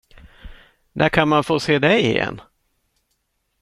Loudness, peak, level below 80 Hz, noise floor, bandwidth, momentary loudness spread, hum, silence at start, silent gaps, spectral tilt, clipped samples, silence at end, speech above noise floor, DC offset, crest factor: -18 LUFS; -2 dBFS; -46 dBFS; -71 dBFS; 13 kHz; 14 LU; none; 0.45 s; none; -5.5 dB/octave; under 0.1%; 1.2 s; 53 dB; under 0.1%; 20 dB